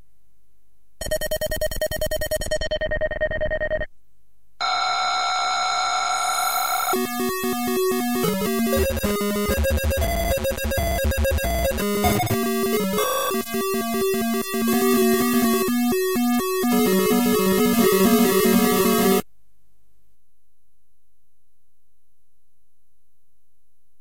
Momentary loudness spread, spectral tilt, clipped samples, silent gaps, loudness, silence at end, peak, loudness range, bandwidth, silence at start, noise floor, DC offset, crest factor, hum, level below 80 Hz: 7 LU; -4 dB/octave; under 0.1%; none; -21 LUFS; 4.8 s; -6 dBFS; 7 LU; 17 kHz; 1 s; -74 dBFS; 1%; 16 dB; none; -34 dBFS